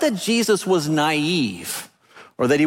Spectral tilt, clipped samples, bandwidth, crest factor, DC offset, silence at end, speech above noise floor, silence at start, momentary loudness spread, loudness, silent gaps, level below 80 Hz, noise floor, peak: -4.5 dB/octave; under 0.1%; 17 kHz; 16 dB; under 0.1%; 0 s; 29 dB; 0 s; 10 LU; -21 LUFS; none; -62 dBFS; -48 dBFS; -6 dBFS